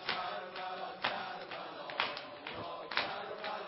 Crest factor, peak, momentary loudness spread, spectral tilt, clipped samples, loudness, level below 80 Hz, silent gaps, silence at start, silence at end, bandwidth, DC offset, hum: 28 dB; -12 dBFS; 7 LU; -6 dB/octave; under 0.1%; -39 LUFS; -76 dBFS; none; 0 s; 0 s; 5.8 kHz; under 0.1%; none